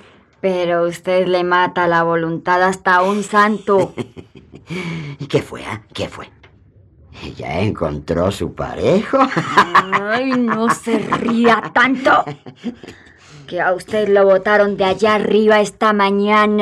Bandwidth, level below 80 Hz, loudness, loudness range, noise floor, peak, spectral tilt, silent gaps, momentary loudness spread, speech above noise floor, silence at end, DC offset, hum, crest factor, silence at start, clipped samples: 13 kHz; -48 dBFS; -15 LUFS; 9 LU; -48 dBFS; -2 dBFS; -5.5 dB/octave; none; 15 LU; 32 dB; 0 s; under 0.1%; none; 16 dB; 0.45 s; under 0.1%